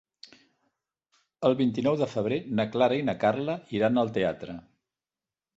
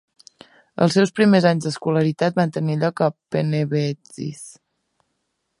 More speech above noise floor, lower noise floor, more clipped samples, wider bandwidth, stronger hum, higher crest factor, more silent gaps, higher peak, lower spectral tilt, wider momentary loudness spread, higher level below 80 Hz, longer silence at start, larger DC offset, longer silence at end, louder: first, over 64 dB vs 54 dB; first, under -90 dBFS vs -74 dBFS; neither; second, 7.8 kHz vs 11.5 kHz; neither; about the same, 20 dB vs 18 dB; neither; second, -10 dBFS vs -2 dBFS; about the same, -7.5 dB/octave vs -6.5 dB/octave; second, 6 LU vs 16 LU; about the same, -64 dBFS vs -64 dBFS; first, 1.4 s vs 0.8 s; neither; second, 0.95 s vs 1.1 s; second, -27 LUFS vs -20 LUFS